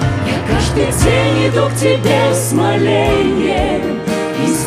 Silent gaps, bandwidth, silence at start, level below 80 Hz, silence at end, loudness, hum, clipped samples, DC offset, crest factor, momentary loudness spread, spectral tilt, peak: none; 16 kHz; 0 s; -28 dBFS; 0 s; -14 LUFS; none; under 0.1%; under 0.1%; 12 dB; 5 LU; -5 dB/octave; 0 dBFS